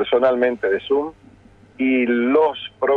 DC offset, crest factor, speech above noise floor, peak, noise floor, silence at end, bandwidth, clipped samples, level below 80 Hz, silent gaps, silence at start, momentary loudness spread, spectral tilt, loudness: under 0.1%; 16 dB; 30 dB; -4 dBFS; -49 dBFS; 0 s; 4.5 kHz; under 0.1%; -58 dBFS; none; 0 s; 7 LU; -7 dB/octave; -19 LUFS